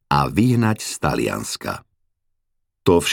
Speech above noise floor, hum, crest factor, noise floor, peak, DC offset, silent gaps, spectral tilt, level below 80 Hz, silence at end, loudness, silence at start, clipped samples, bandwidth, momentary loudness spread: 52 dB; none; 18 dB; -72 dBFS; -2 dBFS; under 0.1%; none; -5 dB/octave; -44 dBFS; 0 s; -20 LUFS; 0.1 s; under 0.1%; 18.5 kHz; 10 LU